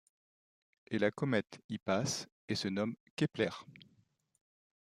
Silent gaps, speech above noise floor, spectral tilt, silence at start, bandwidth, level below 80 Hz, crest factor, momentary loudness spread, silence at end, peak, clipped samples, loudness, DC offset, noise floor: 1.64-1.69 s, 2.32-2.48 s, 3.00-3.17 s; 37 dB; -5 dB/octave; 0.9 s; 14.5 kHz; -76 dBFS; 22 dB; 7 LU; 1.1 s; -18 dBFS; under 0.1%; -36 LUFS; under 0.1%; -73 dBFS